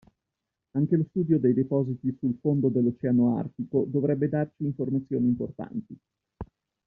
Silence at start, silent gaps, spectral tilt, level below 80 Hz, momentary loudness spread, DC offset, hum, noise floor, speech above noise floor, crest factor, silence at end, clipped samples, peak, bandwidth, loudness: 0.75 s; none; -12.5 dB/octave; -60 dBFS; 13 LU; under 0.1%; none; -85 dBFS; 59 dB; 16 dB; 0.4 s; under 0.1%; -12 dBFS; 2.7 kHz; -27 LUFS